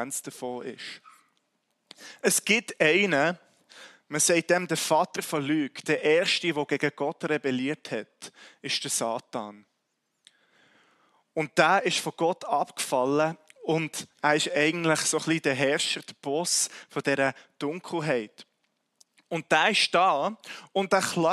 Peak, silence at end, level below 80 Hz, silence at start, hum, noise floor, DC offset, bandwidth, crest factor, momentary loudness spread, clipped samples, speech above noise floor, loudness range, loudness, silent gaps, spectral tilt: -4 dBFS; 0 s; -76 dBFS; 0 s; none; -78 dBFS; under 0.1%; 14.5 kHz; 24 dB; 14 LU; under 0.1%; 51 dB; 5 LU; -26 LUFS; none; -3 dB/octave